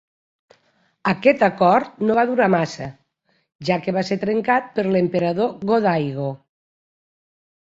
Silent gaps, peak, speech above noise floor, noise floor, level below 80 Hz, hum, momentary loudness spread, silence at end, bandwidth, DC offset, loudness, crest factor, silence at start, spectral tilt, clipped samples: 3.55-3.59 s; -2 dBFS; 48 dB; -67 dBFS; -62 dBFS; none; 11 LU; 1.3 s; 7.8 kHz; under 0.1%; -20 LUFS; 18 dB; 1.05 s; -7 dB/octave; under 0.1%